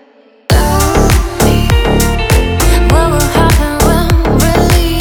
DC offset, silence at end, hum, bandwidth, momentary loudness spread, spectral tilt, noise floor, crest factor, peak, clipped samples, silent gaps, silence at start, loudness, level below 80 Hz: under 0.1%; 0 s; none; 20 kHz; 2 LU; -5 dB/octave; -31 dBFS; 10 dB; 0 dBFS; under 0.1%; none; 0.5 s; -10 LUFS; -14 dBFS